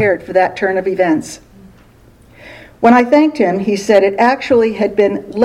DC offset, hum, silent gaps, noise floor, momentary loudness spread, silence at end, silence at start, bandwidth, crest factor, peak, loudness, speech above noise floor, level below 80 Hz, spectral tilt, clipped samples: under 0.1%; none; none; -44 dBFS; 6 LU; 0 s; 0 s; 13 kHz; 14 dB; 0 dBFS; -13 LUFS; 32 dB; -50 dBFS; -5.5 dB/octave; 0.1%